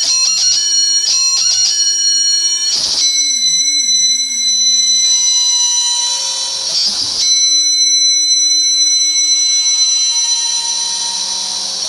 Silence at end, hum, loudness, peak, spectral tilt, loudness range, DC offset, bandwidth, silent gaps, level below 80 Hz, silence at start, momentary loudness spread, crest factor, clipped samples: 0 s; none; -10 LUFS; -2 dBFS; 4 dB/octave; 1 LU; under 0.1%; 16 kHz; none; -58 dBFS; 0 s; 6 LU; 12 dB; under 0.1%